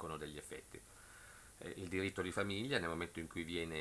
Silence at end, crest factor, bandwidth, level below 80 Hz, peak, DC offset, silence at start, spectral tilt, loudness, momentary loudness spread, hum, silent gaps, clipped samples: 0 s; 24 dB; 11 kHz; -64 dBFS; -20 dBFS; under 0.1%; 0 s; -4.5 dB/octave; -43 LUFS; 17 LU; none; none; under 0.1%